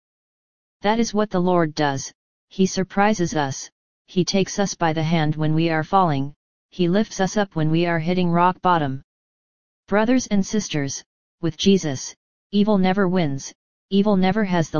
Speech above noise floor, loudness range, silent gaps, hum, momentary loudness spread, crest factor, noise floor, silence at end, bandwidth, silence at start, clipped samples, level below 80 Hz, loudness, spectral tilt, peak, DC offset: over 70 dB; 2 LU; 2.15-2.48 s, 3.72-4.05 s, 6.36-6.69 s, 9.04-9.83 s, 11.06-11.38 s, 12.17-12.50 s, 13.55-13.89 s; none; 11 LU; 18 dB; under -90 dBFS; 0 s; 7.2 kHz; 0.8 s; under 0.1%; -50 dBFS; -21 LUFS; -5.5 dB/octave; -2 dBFS; 2%